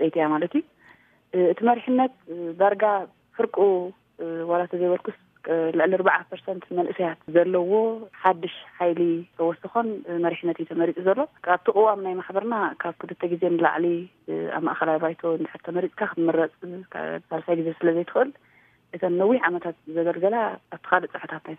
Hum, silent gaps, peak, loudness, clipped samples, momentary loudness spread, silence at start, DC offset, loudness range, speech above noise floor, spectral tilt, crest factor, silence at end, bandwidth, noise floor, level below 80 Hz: none; none; -2 dBFS; -24 LUFS; under 0.1%; 11 LU; 0 s; under 0.1%; 3 LU; 32 dB; -9.5 dB/octave; 22 dB; 0 s; 3.8 kHz; -56 dBFS; -76 dBFS